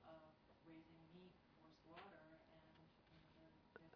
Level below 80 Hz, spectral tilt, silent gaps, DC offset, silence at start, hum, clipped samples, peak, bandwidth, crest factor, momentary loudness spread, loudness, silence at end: -84 dBFS; -4.5 dB/octave; none; under 0.1%; 0 s; none; under 0.1%; -44 dBFS; 5.2 kHz; 24 dB; 6 LU; -66 LUFS; 0 s